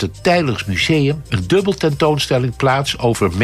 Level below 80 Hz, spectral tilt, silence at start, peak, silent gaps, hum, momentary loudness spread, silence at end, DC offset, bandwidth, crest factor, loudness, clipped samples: -40 dBFS; -5.5 dB/octave; 0 s; -4 dBFS; none; none; 3 LU; 0 s; under 0.1%; 15 kHz; 12 dB; -16 LUFS; under 0.1%